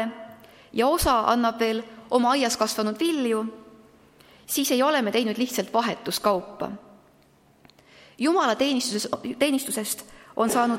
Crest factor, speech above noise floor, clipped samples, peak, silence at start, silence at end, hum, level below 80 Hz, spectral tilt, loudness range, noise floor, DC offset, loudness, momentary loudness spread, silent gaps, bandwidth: 20 dB; 35 dB; under 0.1%; -6 dBFS; 0 s; 0 s; none; -50 dBFS; -3 dB/octave; 4 LU; -58 dBFS; under 0.1%; -24 LUFS; 11 LU; none; 16.5 kHz